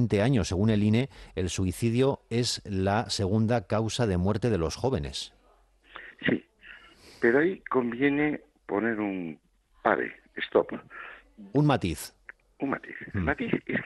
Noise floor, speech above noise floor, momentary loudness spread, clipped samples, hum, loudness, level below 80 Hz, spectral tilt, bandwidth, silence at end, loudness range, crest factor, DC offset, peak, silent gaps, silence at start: -62 dBFS; 35 dB; 15 LU; under 0.1%; none; -28 LUFS; -52 dBFS; -6 dB/octave; 12.5 kHz; 0 s; 3 LU; 20 dB; under 0.1%; -8 dBFS; none; 0 s